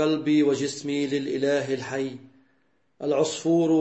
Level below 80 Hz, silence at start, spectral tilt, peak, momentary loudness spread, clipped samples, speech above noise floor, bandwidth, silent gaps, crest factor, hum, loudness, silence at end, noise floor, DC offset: -74 dBFS; 0 s; -5 dB/octave; -10 dBFS; 10 LU; under 0.1%; 45 dB; 8.6 kHz; none; 14 dB; none; -25 LUFS; 0 s; -69 dBFS; under 0.1%